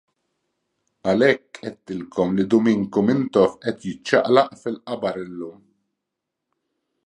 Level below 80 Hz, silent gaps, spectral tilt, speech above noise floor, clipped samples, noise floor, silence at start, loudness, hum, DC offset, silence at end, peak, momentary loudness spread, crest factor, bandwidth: -60 dBFS; none; -6.5 dB/octave; 61 dB; under 0.1%; -82 dBFS; 1.05 s; -21 LUFS; none; under 0.1%; 1.55 s; -2 dBFS; 15 LU; 20 dB; 10.5 kHz